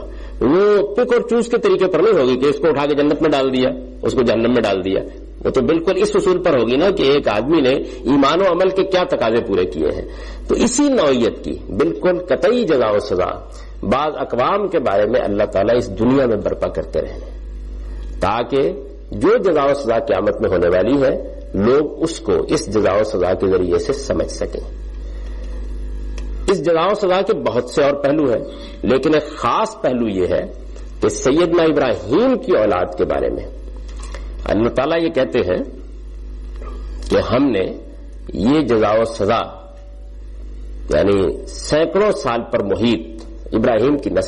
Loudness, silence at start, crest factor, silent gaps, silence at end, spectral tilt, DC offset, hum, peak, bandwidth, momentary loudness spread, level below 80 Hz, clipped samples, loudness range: -17 LUFS; 0 s; 12 dB; none; 0 s; -5.5 dB/octave; under 0.1%; none; -6 dBFS; 11 kHz; 17 LU; -32 dBFS; under 0.1%; 5 LU